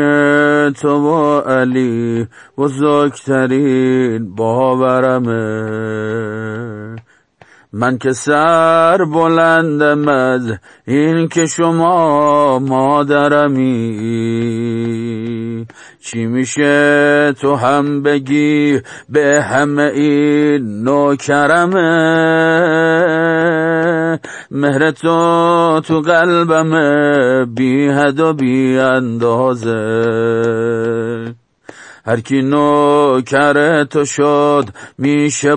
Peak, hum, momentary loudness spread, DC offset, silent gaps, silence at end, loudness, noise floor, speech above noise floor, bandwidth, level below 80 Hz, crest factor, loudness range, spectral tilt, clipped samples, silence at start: 0 dBFS; none; 9 LU; under 0.1%; none; 0 s; -13 LUFS; -47 dBFS; 34 dB; 10 kHz; -60 dBFS; 12 dB; 4 LU; -6 dB/octave; under 0.1%; 0 s